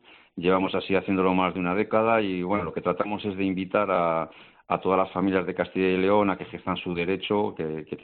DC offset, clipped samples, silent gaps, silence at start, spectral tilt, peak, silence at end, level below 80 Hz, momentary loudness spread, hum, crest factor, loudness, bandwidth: under 0.1%; under 0.1%; none; 0.35 s; -5 dB/octave; -8 dBFS; 0.05 s; -62 dBFS; 8 LU; none; 18 dB; -25 LUFS; 4.5 kHz